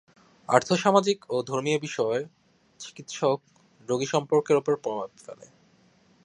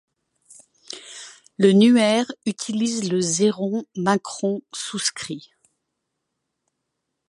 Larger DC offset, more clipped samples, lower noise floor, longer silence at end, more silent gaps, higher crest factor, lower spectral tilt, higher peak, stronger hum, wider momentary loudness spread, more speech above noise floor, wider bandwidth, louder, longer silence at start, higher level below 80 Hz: neither; neither; second, -61 dBFS vs -79 dBFS; second, 0.8 s vs 1.9 s; neither; first, 26 dB vs 20 dB; about the same, -4.5 dB/octave vs -4.5 dB/octave; about the same, -2 dBFS vs -4 dBFS; neither; about the same, 21 LU vs 21 LU; second, 35 dB vs 58 dB; about the same, 10.5 kHz vs 11.5 kHz; second, -26 LUFS vs -21 LUFS; second, 0.5 s vs 0.9 s; about the same, -72 dBFS vs -70 dBFS